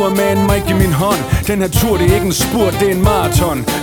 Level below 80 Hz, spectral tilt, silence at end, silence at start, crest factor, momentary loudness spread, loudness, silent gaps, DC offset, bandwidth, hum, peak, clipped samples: -24 dBFS; -5 dB/octave; 0 s; 0 s; 12 dB; 3 LU; -14 LUFS; none; under 0.1%; over 20 kHz; none; 0 dBFS; under 0.1%